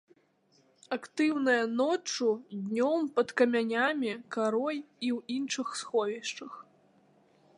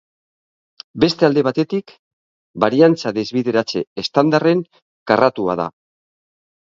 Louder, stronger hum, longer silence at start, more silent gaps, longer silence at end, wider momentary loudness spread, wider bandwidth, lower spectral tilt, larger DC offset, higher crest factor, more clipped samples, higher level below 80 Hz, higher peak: second, -30 LUFS vs -17 LUFS; neither; about the same, 0.9 s vs 0.95 s; second, none vs 1.99-2.54 s, 3.87-3.96 s, 4.82-5.06 s; about the same, 0.95 s vs 1 s; about the same, 10 LU vs 12 LU; first, 11.5 kHz vs 7.6 kHz; second, -3.5 dB/octave vs -6.5 dB/octave; neither; about the same, 20 dB vs 18 dB; neither; second, -86 dBFS vs -56 dBFS; second, -12 dBFS vs 0 dBFS